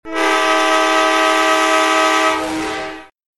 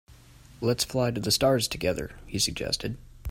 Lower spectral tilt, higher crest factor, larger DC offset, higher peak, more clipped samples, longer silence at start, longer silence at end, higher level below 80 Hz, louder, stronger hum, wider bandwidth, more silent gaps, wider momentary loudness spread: second, -1 dB/octave vs -4 dB/octave; about the same, 16 dB vs 18 dB; neither; first, 0 dBFS vs -10 dBFS; neither; about the same, 0.05 s vs 0.1 s; first, 0.35 s vs 0 s; about the same, -52 dBFS vs -48 dBFS; first, -14 LUFS vs -27 LUFS; neither; second, 13.5 kHz vs 16.5 kHz; neither; second, 9 LU vs 12 LU